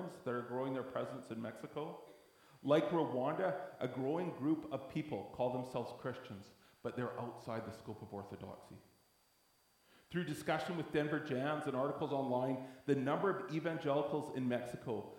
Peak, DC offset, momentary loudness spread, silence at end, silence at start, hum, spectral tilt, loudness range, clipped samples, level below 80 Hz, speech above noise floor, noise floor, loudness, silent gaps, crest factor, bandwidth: -18 dBFS; under 0.1%; 12 LU; 0 s; 0 s; none; -7 dB/octave; 10 LU; under 0.1%; -76 dBFS; 34 dB; -73 dBFS; -40 LUFS; none; 22 dB; 18 kHz